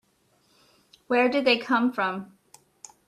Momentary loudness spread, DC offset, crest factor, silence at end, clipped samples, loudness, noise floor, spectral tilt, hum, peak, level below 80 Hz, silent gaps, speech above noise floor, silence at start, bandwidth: 8 LU; under 0.1%; 20 dB; 0.8 s; under 0.1%; -24 LUFS; -66 dBFS; -4 dB/octave; none; -8 dBFS; -74 dBFS; none; 43 dB; 1.1 s; 12.5 kHz